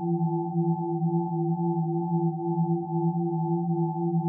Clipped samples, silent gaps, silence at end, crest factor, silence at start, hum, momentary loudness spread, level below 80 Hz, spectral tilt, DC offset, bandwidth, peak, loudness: under 0.1%; none; 0 s; 10 dB; 0 s; none; 1 LU; -78 dBFS; -5.5 dB/octave; under 0.1%; 1 kHz; -16 dBFS; -27 LUFS